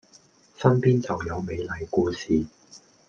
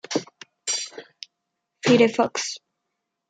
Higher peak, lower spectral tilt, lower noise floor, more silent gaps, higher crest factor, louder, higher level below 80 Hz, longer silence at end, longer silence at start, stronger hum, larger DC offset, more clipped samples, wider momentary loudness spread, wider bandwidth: about the same, -4 dBFS vs -4 dBFS; first, -7.5 dB/octave vs -3.5 dB/octave; second, -57 dBFS vs -80 dBFS; neither; about the same, 22 dB vs 20 dB; about the same, -25 LUFS vs -23 LUFS; first, -52 dBFS vs -74 dBFS; second, 0.3 s vs 0.7 s; first, 0.6 s vs 0.1 s; neither; neither; neither; second, 10 LU vs 24 LU; second, 7.2 kHz vs 9.4 kHz